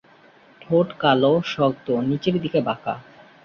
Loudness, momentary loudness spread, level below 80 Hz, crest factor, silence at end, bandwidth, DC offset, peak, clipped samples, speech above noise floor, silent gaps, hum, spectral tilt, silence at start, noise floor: -21 LUFS; 9 LU; -60 dBFS; 18 dB; 0.45 s; 7 kHz; under 0.1%; -4 dBFS; under 0.1%; 31 dB; none; none; -7.5 dB/octave; 0.7 s; -52 dBFS